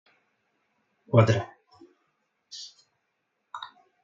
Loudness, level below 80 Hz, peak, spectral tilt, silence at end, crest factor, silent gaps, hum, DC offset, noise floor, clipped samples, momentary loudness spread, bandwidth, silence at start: -23 LUFS; -62 dBFS; -6 dBFS; -7 dB/octave; 0.4 s; 26 dB; none; none; under 0.1%; -78 dBFS; under 0.1%; 23 LU; 7.4 kHz; 1.1 s